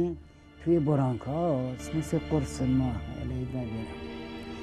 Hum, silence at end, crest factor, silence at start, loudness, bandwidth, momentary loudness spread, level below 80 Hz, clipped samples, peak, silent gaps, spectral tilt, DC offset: none; 0 s; 16 dB; 0 s; -30 LUFS; 13 kHz; 13 LU; -46 dBFS; under 0.1%; -14 dBFS; none; -7.5 dB/octave; under 0.1%